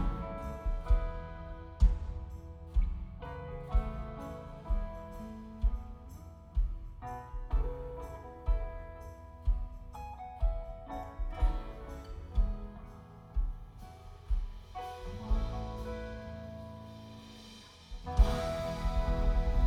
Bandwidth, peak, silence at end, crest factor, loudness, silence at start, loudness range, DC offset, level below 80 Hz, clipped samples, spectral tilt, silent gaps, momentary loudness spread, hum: 7.2 kHz; -12 dBFS; 0 s; 22 dB; -38 LUFS; 0 s; 5 LU; under 0.1%; -34 dBFS; under 0.1%; -7 dB/octave; none; 16 LU; none